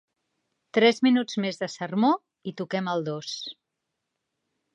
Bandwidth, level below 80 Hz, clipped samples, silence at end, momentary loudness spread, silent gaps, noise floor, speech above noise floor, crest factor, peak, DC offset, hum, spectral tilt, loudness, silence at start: 8.8 kHz; -80 dBFS; under 0.1%; 1.2 s; 15 LU; none; -82 dBFS; 58 dB; 20 dB; -6 dBFS; under 0.1%; none; -5 dB/octave; -26 LUFS; 0.75 s